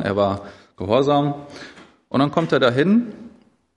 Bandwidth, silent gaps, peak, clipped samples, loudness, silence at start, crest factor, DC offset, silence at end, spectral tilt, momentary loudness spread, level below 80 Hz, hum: 10.5 kHz; none; -4 dBFS; under 0.1%; -19 LUFS; 0 s; 18 dB; under 0.1%; 0.5 s; -7 dB/octave; 21 LU; -60 dBFS; none